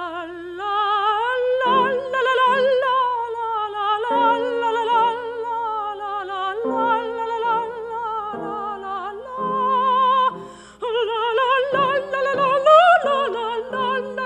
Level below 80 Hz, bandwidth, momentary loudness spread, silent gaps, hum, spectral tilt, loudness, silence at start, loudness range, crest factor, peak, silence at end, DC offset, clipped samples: -60 dBFS; 10 kHz; 11 LU; none; 60 Hz at -60 dBFS; -4 dB/octave; -20 LUFS; 0 s; 6 LU; 18 dB; -2 dBFS; 0 s; under 0.1%; under 0.1%